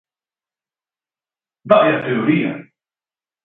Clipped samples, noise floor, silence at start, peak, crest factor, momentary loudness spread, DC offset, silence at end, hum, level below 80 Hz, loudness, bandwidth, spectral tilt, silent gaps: under 0.1%; under -90 dBFS; 1.65 s; 0 dBFS; 20 dB; 11 LU; under 0.1%; 0.8 s; none; -64 dBFS; -16 LUFS; 4.1 kHz; -9.5 dB/octave; none